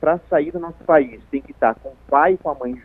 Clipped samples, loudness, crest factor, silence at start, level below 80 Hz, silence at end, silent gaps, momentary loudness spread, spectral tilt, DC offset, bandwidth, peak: under 0.1%; -19 LUFS; 18 dB; 0 s; -48 dBFS; 0.05 s; none; 12 LU; -9.5 dB/octave; under 0.1%; 3.9 kHz; -2 dBFS